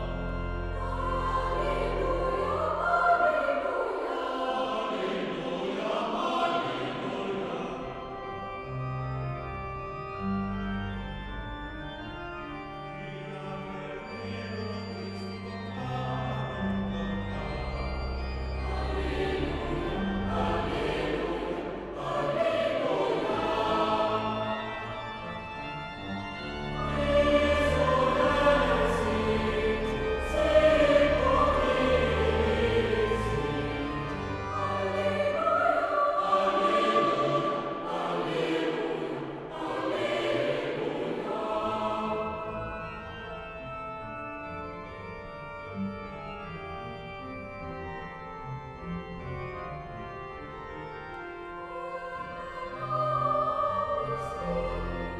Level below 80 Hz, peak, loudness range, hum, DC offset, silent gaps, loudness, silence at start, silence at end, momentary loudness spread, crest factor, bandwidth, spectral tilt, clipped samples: -42 dBFS; -10 dBFS; 14 LU; none; under 0.1%; none; -30 LUFS; 0 s; 0 s; 14 LU; 20 dB; 12.5 kHz; -6.5 dB/octave; under 0.1%